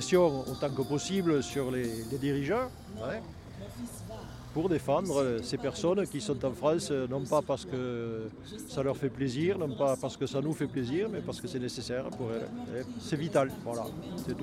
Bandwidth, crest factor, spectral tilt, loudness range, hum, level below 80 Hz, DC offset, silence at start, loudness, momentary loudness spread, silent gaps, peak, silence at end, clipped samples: 16 kHz; 20 dB; -6 dB/octave; 4 LU; none; -56 dBFS; under 0.1%; 0 s; -32 LUFS; 11 LU; none; -12 dBFS; 0 s; under 0.1%